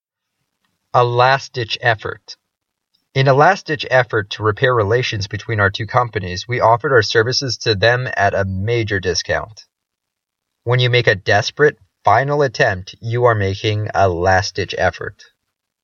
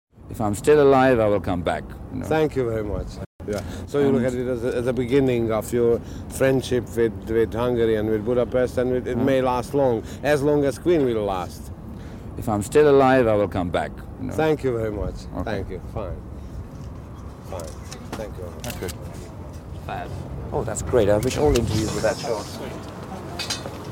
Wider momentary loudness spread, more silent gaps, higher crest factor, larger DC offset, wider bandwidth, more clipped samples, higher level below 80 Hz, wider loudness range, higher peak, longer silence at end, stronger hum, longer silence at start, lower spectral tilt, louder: second, 9 LU vs 18 LU; second, none vs 3.26-3.39 s; about the same, 18 dB vs 18 dB; neither; second, 7.2 kHz vs 17 kHz; neither; second, -48 dBFS vs -38 dBFS; second, 3 LU vs 12 LU; first, 0 dBFS vs -6 dBFS; first, 0.7 s vs 0 s; neither; first, 0.95 s vs 0.15 s; about the same, -5 dB/octave vs -6 dB/octave; first, -16 LUFS vs -22 LUFS